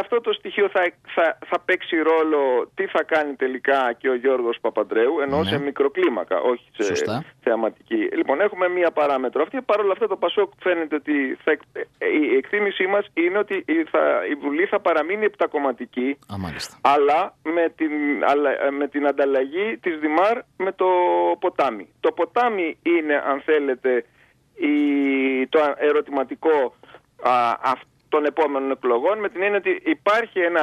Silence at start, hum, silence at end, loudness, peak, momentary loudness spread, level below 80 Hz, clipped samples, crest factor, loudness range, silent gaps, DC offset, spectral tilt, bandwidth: 0 s; none; 0 s; -21 LUFS; -4 dBFS; 5 LU; -64 dBFS; under 0.1%; 18 dB; 1 LU; none; under 0.1%; -5.5 dB/octave; 12 kHz